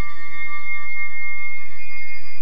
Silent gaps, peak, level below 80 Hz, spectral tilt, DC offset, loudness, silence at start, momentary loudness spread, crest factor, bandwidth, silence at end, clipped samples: none; -8 dBFS; -54 dBFS; -5 dB/octave; 30%; -29 LUFS; 0 s; 7 LU; 10 dB; 11.5 kHz; 0 s; under 0.1%